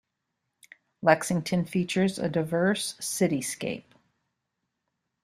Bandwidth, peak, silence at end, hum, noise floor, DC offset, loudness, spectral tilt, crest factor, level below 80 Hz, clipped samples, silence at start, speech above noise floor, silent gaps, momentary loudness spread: 15 kHz; -4 dBFS; 1.45 s; none; -82 dBFS; under 0.1%; -27 LUFS; -5 dB/octave; 24 dB; -66 dBFS; under 0.1%; 1 s; 55 dB; none; 8 LU